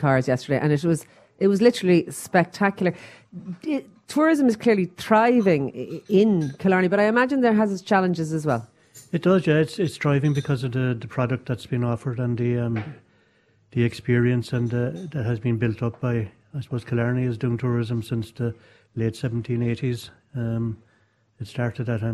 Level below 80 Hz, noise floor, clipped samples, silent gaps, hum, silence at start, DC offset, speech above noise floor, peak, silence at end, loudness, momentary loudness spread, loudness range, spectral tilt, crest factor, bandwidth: -56 dBFS; -63 dBFS; under 0.1%; none; none; 0 s; under 0.1%; 41 dB; -4 dBFS; 0 s; -23 LUFS; 12 LU; 7 LU; -7 dB/octave; 18 dB; 13.5 kHz